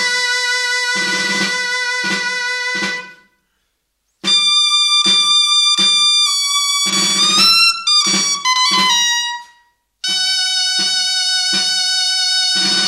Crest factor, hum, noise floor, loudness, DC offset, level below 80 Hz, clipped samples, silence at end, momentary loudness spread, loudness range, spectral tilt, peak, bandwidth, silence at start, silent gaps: 14 dB; none; -68 dBFS; -12 LUFS; under 0.1%; -64 dBFS; under 0.1%; 0 s; 8 LU; 7 LU; 0.5 dB/octave; -2 dBFS; 16 kHz; 0 s; none